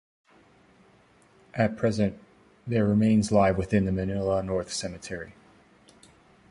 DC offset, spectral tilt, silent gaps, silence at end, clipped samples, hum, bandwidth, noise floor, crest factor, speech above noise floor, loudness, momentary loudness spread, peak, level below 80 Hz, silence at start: under 0.1%; -6.5 dB/octave; none; 1.2 s; under 0.1%; none; 11.5 kHz; -59 dBFS; 20 dB; 34 dB; -26 LUFS; 16 LU; -8 dBFS; -48 dBFS; 1.55 s